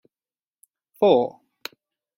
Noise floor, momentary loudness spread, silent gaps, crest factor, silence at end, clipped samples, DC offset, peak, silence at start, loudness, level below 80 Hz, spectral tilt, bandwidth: under -90 dBFS; 21 LU; none; 22 dB; 0.9 s; under 0.1%; under 0.1%; -4 dBFS; 1 s; -21 LUFS; -72 dBFS; -6 dB/octave; 16.5 kHz